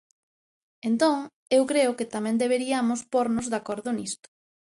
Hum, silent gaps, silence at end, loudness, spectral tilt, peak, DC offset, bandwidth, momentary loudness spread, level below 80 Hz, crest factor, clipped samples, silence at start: none; 1.33-1.46 s; 0.6 s; -26 LUFS; -4 dB/octave; -10 dBFS; under 0.1%; 11.5 kHz; 8 LU; -66 dBFS; 16 dB; under 0.1%; 0.85 s